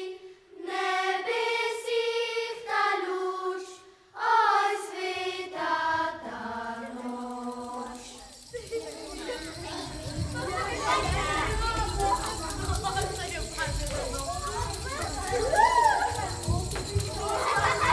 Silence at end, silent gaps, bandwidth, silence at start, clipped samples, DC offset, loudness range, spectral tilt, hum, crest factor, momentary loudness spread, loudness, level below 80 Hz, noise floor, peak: 0 s; none; 11 kHz; 0 s; under 0.1%; under 0.1%; 9 LU; -3.5 dB/octave; none; 20 dB; 13 LU; -29 LUFS; -42 dBFS; -49 dBFS; -8 dBFS